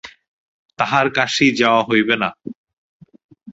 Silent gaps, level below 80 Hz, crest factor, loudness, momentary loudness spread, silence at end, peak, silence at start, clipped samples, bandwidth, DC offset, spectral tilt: 0.28-0.69 s, 2.55-2.64 s, 2.73-3.00 s, 3.24-3.29 s; -60 dBFS; 18 dB; -16 LUFS; 11 LU; 0 s; 0 dBFS; 0.05 s; under 0.1%; 8 kHz; under 0.1%; -4 dB/octave